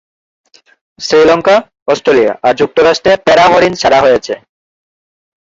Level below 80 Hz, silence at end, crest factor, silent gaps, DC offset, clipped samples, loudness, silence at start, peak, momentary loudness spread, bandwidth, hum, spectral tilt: -44 dBFS; 1.1 s; 10 dB; 1.82-1.86 s; under 0.1%; under 0.1%; -9 LUFS; 1 s; 0 dBFS; 8 LU; 7.8 kHz; none; -4 dB/octave